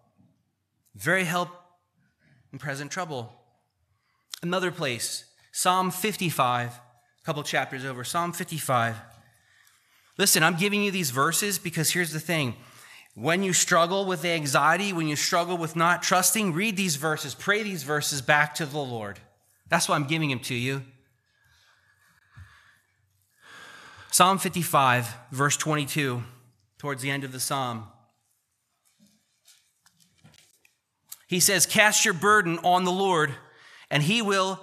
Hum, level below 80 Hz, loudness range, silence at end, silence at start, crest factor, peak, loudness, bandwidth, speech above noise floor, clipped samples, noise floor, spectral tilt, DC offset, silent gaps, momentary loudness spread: none; -72 dBFS; 11 LU; 0 s; 0.95 s; 24 dB; -4 dBFS; -24 LUFS; 15 kHz; 50 dB; under 0.1%; -75 dBFS; -3 dB/octave; under 0.1%; none; 15 LU